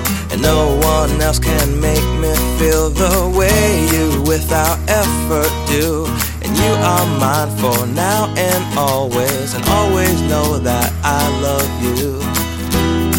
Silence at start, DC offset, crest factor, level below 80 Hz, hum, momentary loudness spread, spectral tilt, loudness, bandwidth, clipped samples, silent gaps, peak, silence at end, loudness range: 0 s; under 0.1%; 14 dB; -22 dBFS; none; 4 LU; -4.5 dB/octave; -15 LUFS; 17 kHz; under 0.1%; none; 0 dBFS; 0 s; 1 LU